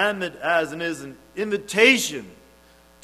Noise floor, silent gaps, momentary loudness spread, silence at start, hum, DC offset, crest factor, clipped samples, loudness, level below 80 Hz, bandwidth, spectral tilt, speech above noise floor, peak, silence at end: -53 dBFS; none; 19 LU; 0 s; none; under 0.1%; 22 dB; under 0.1%; -21 LUFS; -60 dBFS; 15.5 kHz; -2.5 dB/octave; 30 dB; -2 dBFS; 0.7 s